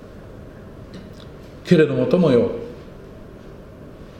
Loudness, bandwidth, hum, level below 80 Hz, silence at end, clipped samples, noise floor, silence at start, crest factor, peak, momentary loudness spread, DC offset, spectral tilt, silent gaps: -18 LUFS; 9.4 kHz; none; -46 dBFS; 0 s; under 0.1%; -39 dBFS; 0.05 s; 20 dB; -2 dBFS; 25 LU; under 0.1%; -8 dB/octave; none